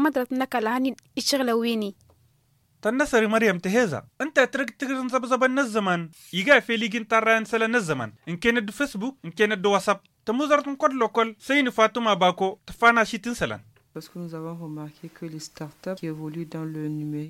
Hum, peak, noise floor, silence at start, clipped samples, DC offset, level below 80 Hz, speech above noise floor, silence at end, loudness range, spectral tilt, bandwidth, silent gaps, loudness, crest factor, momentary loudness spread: none; -4 dBFS; -65 dBFS; 0 s; under 0.1%; under 0.1%; -58 dBFS; 40 dB; 0 s; 4 LU; -4.5 dB/octave; 16.5 kHz; none; -24 LUFS; 20 dB; 16 LU